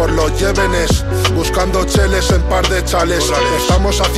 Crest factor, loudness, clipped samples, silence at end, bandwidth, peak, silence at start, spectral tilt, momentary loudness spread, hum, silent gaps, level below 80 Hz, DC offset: 12 dB; -14 LUFS; under 0.1%; 0 s; 15.5 kHz; -2 dBFS; 0 s; -4.5 dB/octave; 2 LU; none; none; -18 dBFS; under 0.1%